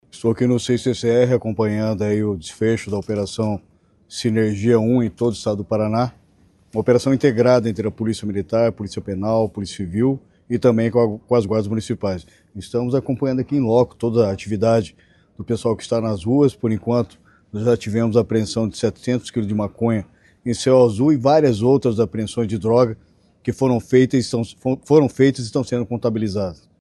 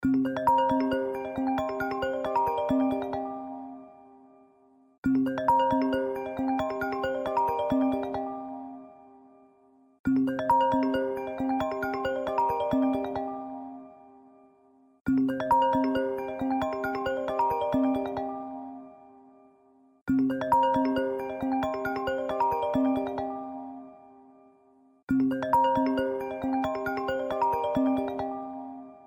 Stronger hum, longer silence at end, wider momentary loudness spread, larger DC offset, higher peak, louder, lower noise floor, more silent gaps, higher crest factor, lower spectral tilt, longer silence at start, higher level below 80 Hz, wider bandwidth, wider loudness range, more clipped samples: neither; first, 0.25 s vs 0.05 s; second, 10 LU vs 14 LU; neither; first, -2 dBFS vs -12 dBFS; first, -19 LUFS vs -28 LUFS; second, -55 dBFS vs -61 dBFS; second, none vs 4.98-5.03 s, 9.99-10.04 s, 15.01-15.05 s, 20.01-20.06 s, 25.03-25.07 s; about the same, 18 dB vs 16 dB; about the same, -7 dB/octave vs -7 dB/octave; first, 0.15 s vs 0 s; first, -52 dBFS vs -58 dBFS; second, 12 kHz vs 16 kHz; about the same, 3 LU vs 4 LU; neither